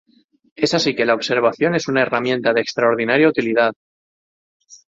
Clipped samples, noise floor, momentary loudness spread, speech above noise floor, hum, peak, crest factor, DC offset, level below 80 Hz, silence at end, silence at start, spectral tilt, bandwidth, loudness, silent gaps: under 0.1%; under -90 dBFS; 4 LU; over 73 dB; none; -2 dBFS; 18 dB; under 0.1%; -62 dBFS; 0.15 s; 0.6 s; -4.5 dB/octave; 7.8 kHz; -18 LUFS; 3.76-4.60 s